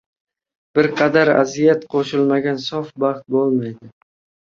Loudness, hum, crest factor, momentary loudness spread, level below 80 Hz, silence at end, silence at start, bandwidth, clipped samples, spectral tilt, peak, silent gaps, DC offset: -18 LUFS; none; 18 dB; 8 LU; -62 dBFS; 0.7 s; 0.75 s; 7.4 kHz; under 0.1%; -6 dB/octave; 0 dBFS; none; under 0.1%